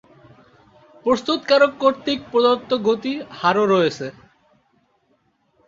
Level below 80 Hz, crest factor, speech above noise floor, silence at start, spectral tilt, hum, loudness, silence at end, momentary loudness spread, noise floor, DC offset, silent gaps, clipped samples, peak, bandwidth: -62 dBFS; 18 dB; 46 dB; 1.05 s; -5 dB/octave; none; -19 LUFS; 1.55 s; 10 LU; -64 dBFS; under 0.1%; none; under 0.1%; -2 dBFS; 7.6 kHz